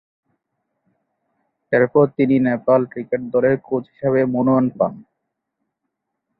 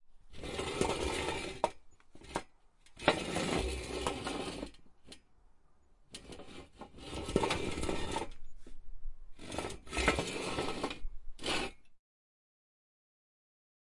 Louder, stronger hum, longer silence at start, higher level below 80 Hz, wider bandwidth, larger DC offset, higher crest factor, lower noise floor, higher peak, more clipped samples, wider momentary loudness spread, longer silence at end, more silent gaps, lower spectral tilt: first, -18 LUFS vs -37 LUFS; neither; first, 1.7 s vs 0 s; second, -60 dBFS vs -48 dBFS; second, 4.6 kHz vs 11.5 kHz; neither; second, 18 dB vs 30 dB; first, -78 dBFS vs -63 dBFS; first, -2 dBFS vs -8 dBFS; neither; second, 7 LU vs 22 LU; second, 1.4 s vs 2.05 s; neither; first, -12.5 dB/octave vs -4 dB/octave